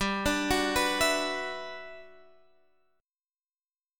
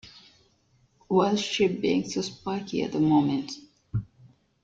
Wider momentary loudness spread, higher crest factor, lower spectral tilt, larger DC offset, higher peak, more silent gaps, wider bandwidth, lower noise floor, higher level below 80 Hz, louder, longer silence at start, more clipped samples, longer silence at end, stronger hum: first, 16 LU vs 12 LU; about the same, 20 dB vs 18 dB; second, -3 dB/octave vs -5.5 dB/octave; neither; second, -14 dBFS vs -10 dBFS; neither; first, 17.5 kHz vs 7.8 kHz; first, under -90 dBFS vs -65 dBFS; first, -50 dBFS vs -58 dBFS; about the same, -28 LUFS vs -26 LUFS; about the same, 0 s vs 0.05 s; neither; first, 1.9 s vs 0.6 s; neither